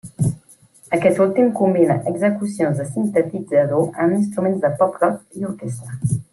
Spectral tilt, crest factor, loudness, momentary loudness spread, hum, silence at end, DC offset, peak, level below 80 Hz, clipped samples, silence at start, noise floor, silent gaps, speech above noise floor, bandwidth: -8 dB/octave; 16 dB; -19 LUFS; 11 LU; none; 0.1 s; under 0.1%; -2 dBFS; -56 dBFS; under 0.1%; 0.05 s; -49 dBFS; none; 31 dB; 12.5 kHz